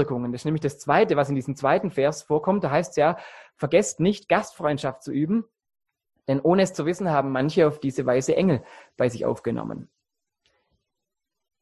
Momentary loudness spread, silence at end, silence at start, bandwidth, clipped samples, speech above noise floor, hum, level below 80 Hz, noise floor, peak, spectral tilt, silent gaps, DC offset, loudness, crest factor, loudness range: 8 LU; 1.8 s; 0 s; 12.5 kHz; under 0.1%; 62 dB; none; -60 dBFS; -85 dBFS; -4 dBFS; -6 dB/octave; none; under 0.1%; -24 LUFS; 20 dB; 4 LU